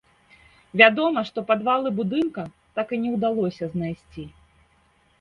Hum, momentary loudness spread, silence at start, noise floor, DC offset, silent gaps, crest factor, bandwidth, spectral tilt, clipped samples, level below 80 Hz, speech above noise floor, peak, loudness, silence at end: none; 20 LU; 0.75 s; -62 dBFS; under 0.1%; none; 24 dB; 7 kHz; -7 dB/octave; under 0.1%; -60 dBFS; 39 dB; 0 dBFS; -22 LUFS; 0.9 s